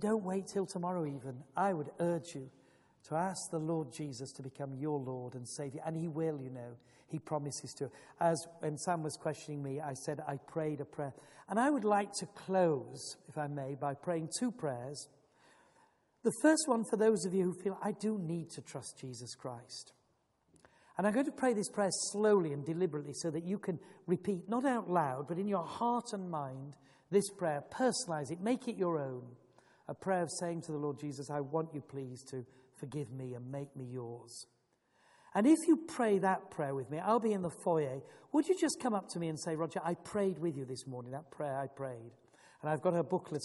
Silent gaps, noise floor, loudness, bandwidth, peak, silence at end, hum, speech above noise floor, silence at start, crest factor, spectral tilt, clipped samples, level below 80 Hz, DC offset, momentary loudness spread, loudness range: none; -76 dBFS; -36 LUFS; 11.5 kHz; -16 dBFS; 0 s; none; 40 dB; 0 s; 20 dB; -5.5 dB/octave; under 0.1%; -80 dBFS; under 0.1%; 14 LU; 7 LU